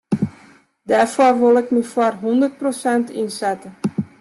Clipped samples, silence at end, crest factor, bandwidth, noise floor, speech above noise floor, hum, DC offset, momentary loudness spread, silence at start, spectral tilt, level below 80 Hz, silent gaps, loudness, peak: under 0.1%; 0.15 s; 16 dB; 12.5 kHz; -49 dBFS; 32 dB; none; under 0.1%; 11 LU; 0.1 s; -6 dB/octave; -60 dBFS; none; -18 LUFS; -4 dBFS